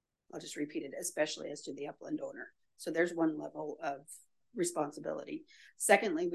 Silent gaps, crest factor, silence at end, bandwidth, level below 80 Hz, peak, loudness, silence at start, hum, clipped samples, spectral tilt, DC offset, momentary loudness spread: none; 26 dB; 0 s; 12.5 kHz; -84 dBFS; -12 dBFS; -36 LUFS; 0.35 s; none; under 0.1%; -3.5 dB/octave; under 0.1%; 19 LU